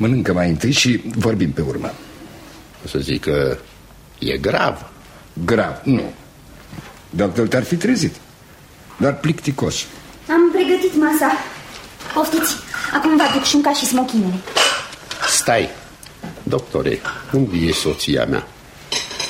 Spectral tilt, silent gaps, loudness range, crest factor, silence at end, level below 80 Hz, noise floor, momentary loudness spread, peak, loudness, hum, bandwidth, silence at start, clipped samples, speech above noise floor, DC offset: -4 dB/octave; none; 6 LU; 18 dB; 0 s; -42 dBFS; -43 dBFS; 20 LU; 0 dBFS; -18 LUFS; none; 16.5 kHz; 0 s; under 0.1%; 26 dB; under 0.1%